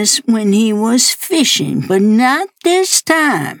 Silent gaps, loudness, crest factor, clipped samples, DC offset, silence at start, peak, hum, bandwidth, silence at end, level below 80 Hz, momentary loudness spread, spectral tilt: none; -12 LUFS; 12 dB; under 0.1%; under 0.1%; 0 s; 0 dBFS; none; over 20 kHz; 0 s; -64 dBFS; 4 LU; -3 dB/octave